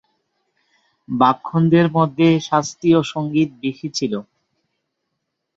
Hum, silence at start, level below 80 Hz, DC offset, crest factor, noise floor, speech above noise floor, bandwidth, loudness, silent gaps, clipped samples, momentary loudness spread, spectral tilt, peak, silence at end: none; 1.1 s; -58 dBFS; under 0.1%; 18 dB; -76 dBFS; 59 dB; 7.8 kHz; -18 LUFS; none; under 0.1%; 10 LU; -6.5 dB/octave; -2 dBFS; 1.35 s